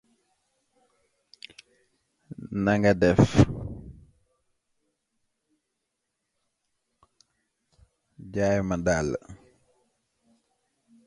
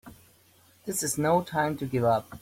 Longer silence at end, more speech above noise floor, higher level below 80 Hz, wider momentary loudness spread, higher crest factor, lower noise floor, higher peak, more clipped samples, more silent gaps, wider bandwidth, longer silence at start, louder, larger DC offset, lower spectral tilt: first, 1.7 s vs 0.05 s; first, 59 dB vs 33 dB; first, -48 dBFS vs -60 dBFS; first, 26 LU vs 7 LU; first, 26 dB vs 18 dB; first, -81 dBFS vs -60 dBFS; first, -4 dBFS vs -12 dBFS; neither; neither; second, 11.5 kHz vs 16.5 kHz; first, 2.3 s vs 0.05 s; first, -24 LUFS vs -27 LUFS; neither; first, -7 dB/octave vs -5 dB/octave